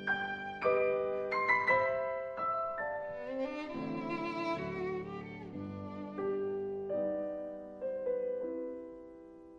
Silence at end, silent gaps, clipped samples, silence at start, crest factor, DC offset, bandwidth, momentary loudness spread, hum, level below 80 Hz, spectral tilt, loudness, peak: 0 s; none; under 0.1%; 0 s; 18 dB; under 0.1%; 7.2 kHz; 13 LU; none; -68 dBFS; -7 dB/octave; -36 LUFS; -18 dBFS